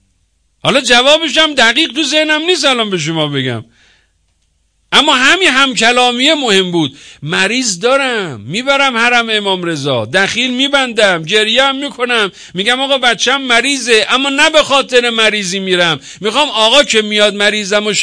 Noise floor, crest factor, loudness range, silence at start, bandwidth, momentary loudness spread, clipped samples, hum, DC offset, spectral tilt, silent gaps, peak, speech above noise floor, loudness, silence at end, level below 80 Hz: -59 dBFS; 12 dB; 3 LU; 0.65 s; 11 kHz; 8 LU; 0.2%; none; 0.2%; -2.5 dB/octave; none; 0 dBFS; 47 dB; -10 LUFS; 0 s; -50 dBFS